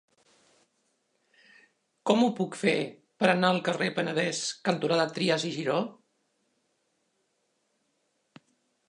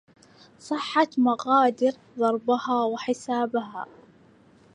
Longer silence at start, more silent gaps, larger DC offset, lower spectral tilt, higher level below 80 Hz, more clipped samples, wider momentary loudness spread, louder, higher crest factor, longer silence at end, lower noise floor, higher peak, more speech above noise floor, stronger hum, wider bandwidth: first, 2.05 s vs 0.65 s; neither; neither; about the same, -4.5 dB/octave vs -4.5 dB/octave; about the same, -80 dBFS vs -76 dBFS; neither; second, 6 LU vs 11 LU; second, -28 LUFS vs -24 LUFS; first, 24 dB vs 18 dB; first, 2.95 s vs 0.9 s; first, -75 dBFS vs -56 dBFS; about the same, -8 dBFS vs -6 dBFS; first, 48 dB vs 31 dB; neither; about the same, 11 kHz vs 10 kHz